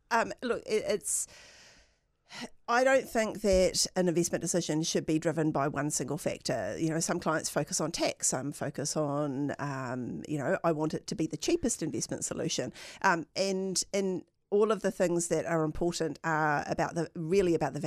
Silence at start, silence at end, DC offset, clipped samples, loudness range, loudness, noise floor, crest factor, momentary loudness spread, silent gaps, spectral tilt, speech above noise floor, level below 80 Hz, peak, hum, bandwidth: 0.1 s; 0 s; under 0.1%; under 0.1%; 4 LU; -31 LUFS; -68 dBFS; 20 dB; 7 LU; none; -4 dB/octave; 37 dB; -54 dBFS; -10 dBFS; none; 15 kHz